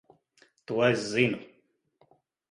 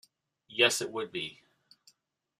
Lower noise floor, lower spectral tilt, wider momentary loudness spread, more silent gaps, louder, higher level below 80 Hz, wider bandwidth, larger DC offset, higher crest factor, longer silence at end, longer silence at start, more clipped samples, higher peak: about the same, -69 dBFS vs -69 dBFS; first, -5 dB/octave vs -1.5 dB/octave; second, 10 LU vs 14 LU; neither; first, -27 LUFS vs -30 LUFS; first, -68 dBFS vs -80 dBFS; second, 11.5 kHz vs 14.5 kHz; neither; about the same, 22 dB vs 26 dB; about the same, 1.05 s vs 1.05 s; first, 0.7 s vs 0.5 s; neither; about the same, -10 dBFS vs -10 dBFS